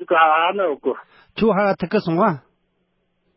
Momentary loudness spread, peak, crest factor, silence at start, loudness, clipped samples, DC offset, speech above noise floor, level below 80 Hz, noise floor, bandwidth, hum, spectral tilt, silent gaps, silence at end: 15 LU; -2 dBFS; 18 dB; 0 s; -19 LUFS; under 0.1%; under 0.1%; 50 dB; -56 dBFS; -68 dBFS; 5.8 kHz; none; -11 dB/octave; none; 0.95 s